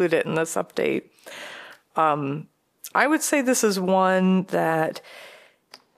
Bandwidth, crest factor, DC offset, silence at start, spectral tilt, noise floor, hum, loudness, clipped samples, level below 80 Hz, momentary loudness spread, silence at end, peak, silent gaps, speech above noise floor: 15 kHz; 20 dB; under 0.1%; 0 s; -4.5 dB/octave; -53 dBFS; none; -22 LUFS; under 0.1%; -74 dBFS; 19 LU; 0.2 s; -4 dBFS; none; 30 dB